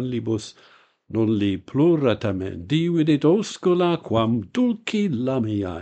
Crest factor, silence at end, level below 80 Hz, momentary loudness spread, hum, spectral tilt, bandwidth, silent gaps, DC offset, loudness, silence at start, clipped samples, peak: 16 dB; 0 s; -56 dBFS; 8 LU; none; -7 dB/octave; 8.8 kHz; none; under 0.1%; -22 LUFS; 0 s; under 0.1%; -6 dBFS